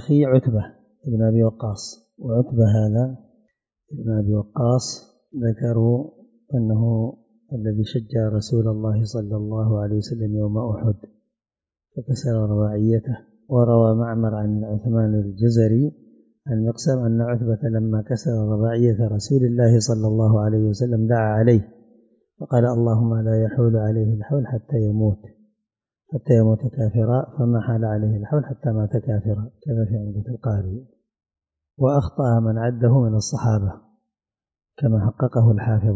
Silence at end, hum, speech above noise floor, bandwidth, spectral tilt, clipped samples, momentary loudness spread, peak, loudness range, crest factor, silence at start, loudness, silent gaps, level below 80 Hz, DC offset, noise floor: 0 s; none; over 70 dB; 7.8 kHz; -8 dB/octave; under 0.1%; 10 LU; -4 dBFS; 5 LU; 16 dB; 0 s; -21 LUFS; none; -44 dBFS; under 0.1%; under -90 dBFS